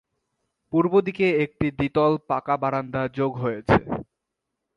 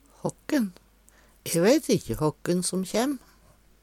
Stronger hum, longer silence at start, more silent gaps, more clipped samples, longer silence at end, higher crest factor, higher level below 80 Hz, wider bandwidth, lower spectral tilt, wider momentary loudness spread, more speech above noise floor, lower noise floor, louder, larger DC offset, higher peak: neither; first, 0.7 s vs 0.25 s; neither; neither; about the same, 0.75 s vs 0.65 s; about the same, 22 dB vs 18 dB; about the same, -50 dBFS vs -52 dBFS; second, 7.2 kHz vs 19 kHz; first, -8.5 dB/octave vs -5 dB/octave; second, 7 LU vs 13 LU; first, 60 dB vs 33 dB; first, -82 dBFS vs -58 dBFS; first, -23 LUFS vs -26 LUFS; neither; first, -2 dBFS vs -8 dBFS